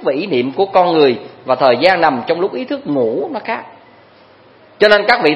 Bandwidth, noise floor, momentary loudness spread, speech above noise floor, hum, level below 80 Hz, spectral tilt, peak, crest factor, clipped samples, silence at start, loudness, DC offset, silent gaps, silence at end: 11 kHz; -45 dBFS; 11 LU; 32 dB; none; -58 dBFS; -6 dB/octave; 0 dBFS; 14 dB; under 0.1%; 0 s; -14 LUFS; under 0.1%; none; 0 s